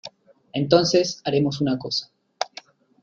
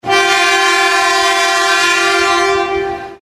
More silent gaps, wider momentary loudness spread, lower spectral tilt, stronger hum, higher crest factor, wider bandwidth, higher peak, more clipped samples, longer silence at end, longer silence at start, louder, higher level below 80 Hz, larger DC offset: neither; first, 14 LU vs 6 LU; first, -5 dB/octave vs -1 dB/octave; neither; first, 22 dB vs 12 dB; second, 7.6 kHz vs 14 kHz; about the same, -2 dBFS vs 0 dBFS; neither; first, 0.6 s vs 0.05 s; about the same, 0.05 s vs 0.05 s; second, -23 LUFS vs -11 LUFS; second, -60 dBFS vs -46 dBFS; neither